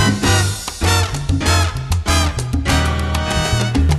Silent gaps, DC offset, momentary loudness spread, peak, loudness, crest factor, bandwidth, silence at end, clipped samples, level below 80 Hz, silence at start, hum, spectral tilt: none; under 0.1%; 4 LU; -2 dBFS; -17 LUFS; 14 dB; 13 kHz; 0 s; under 0.1%; -22 dBFS; 0 s; none; -4 dB/octave